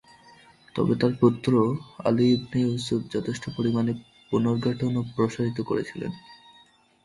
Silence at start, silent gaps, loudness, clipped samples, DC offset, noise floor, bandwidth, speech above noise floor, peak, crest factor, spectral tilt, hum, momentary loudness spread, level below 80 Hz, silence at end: 0.75 s; none; -26 LUFS; under 0.1%; under 0.1%; -58 dBFS; 11.5 kHz; 33 dB; -6 dBFS; 18 dB; -7.5 dB/octave; none; 11 LU; -58 dBFS; 0.7 s